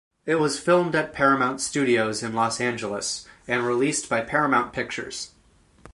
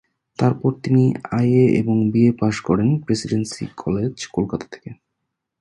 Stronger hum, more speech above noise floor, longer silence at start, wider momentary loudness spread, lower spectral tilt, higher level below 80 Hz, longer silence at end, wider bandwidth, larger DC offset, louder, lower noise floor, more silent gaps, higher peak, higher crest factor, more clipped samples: neither; second, 34 dB vs 59 dB; second, 0.25 s vs 0.4 s; second, 9 LU vs 13 LU; second, -4 dB/octave vs -7.5 dB/octave; second, -58 dBFS vs -50 dBFS; second, 0.05 s vs 0.65 s; about the same, 11.5 kHz vs 11 kHz; neither; second, -24 LUFS vs -19 LUFS; second, -58 dBFS vs -78 dBFS; neither; second, -6 dBFS vs -2 dBFS; about the same, 18 dB vs 16 dB; neither